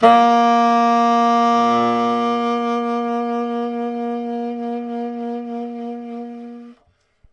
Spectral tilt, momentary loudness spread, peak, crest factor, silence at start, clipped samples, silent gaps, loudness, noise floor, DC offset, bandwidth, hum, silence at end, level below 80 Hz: -5 dB/octave; 15 LU; 0 dBFS; 18 dB; 0 s; under 0.1%; none; -18 LUFS; -60 dBFS; under 0.1%; 9.6 kHz; none; 0.6 s; -66 dBFS